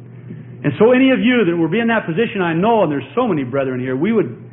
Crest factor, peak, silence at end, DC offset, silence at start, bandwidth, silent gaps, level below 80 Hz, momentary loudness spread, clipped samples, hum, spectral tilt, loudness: 14 dB; -2 dBFS; 0 s; under 0.1%; 0 s; 3.9 kHz; none; -56 dBFS; 10 LU; under 0.1%; none; -12 dB/octave; -16 LUFS